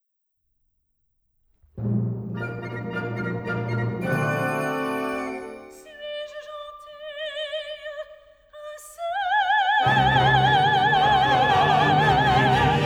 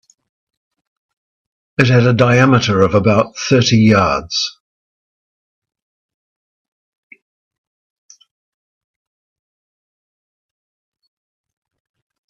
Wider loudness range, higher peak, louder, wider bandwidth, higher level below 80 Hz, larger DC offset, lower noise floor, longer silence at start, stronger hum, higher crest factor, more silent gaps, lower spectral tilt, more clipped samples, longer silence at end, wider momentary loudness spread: first, 15 LU vs 10 LU; second, -6 dBFS vs 0 dBFS; second, -22 LUFS vs -13 LUFS; first, 15.5 kHz vs 7.4 kHz; about the same, -46 dBFS vs -50 dBFS; neither; second, -75 dBFS vs under -90 dBFS; about the same, 1.75 s vs 1.8 s; neither; about the same, 16 dB vs 18 dB; neither; about the same, -5.5 dB/octave vs -5.5 dB/octave; neither; second, 0 s vs 7.8 s; first, 20 LU vs 9 LU